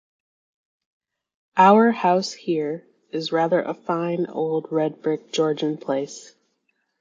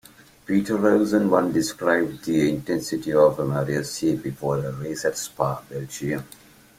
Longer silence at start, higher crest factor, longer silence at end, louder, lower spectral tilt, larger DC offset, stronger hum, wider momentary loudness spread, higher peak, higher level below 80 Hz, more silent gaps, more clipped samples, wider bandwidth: first, 1.55 s vs 0.5 s; about the same, 20 dB vs 20 dB; first, 0.75 s vs 0.5 s; about the same, -22 LUFS vs -23 LUFS; about the same, -5.5 dB/octave vs -5.5 dB/octave; neither; neither; first, 14 LU vs 10 LU; about the same, -2 dBFS vs -4 dBFS; second, -74 dBFS vs -56 dBFS; neither; neither; second, 7.6 kHz vs 16.5 kHz